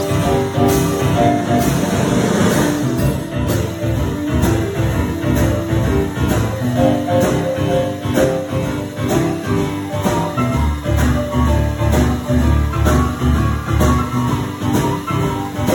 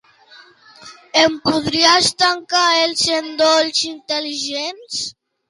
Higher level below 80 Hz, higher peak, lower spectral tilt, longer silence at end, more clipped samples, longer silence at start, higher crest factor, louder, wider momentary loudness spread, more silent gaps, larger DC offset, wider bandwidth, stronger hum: first, -24 dBFS vs -56 dBFS; about the same, -2 dBFS vs -2 dBFS; first, -6.5 dB/octave vs -1.5 dB/octave; second, 0 s vs 0.4 s; neither; second, 0 s vs 0.8 s; about the same, 14 dB vs 16 dB; about the same, -17 LUFS vs -16 LUFS; second, 4 LU vs 12 LU; neither; neither; first, 17.5 kHz vs 11.5 kHz; neither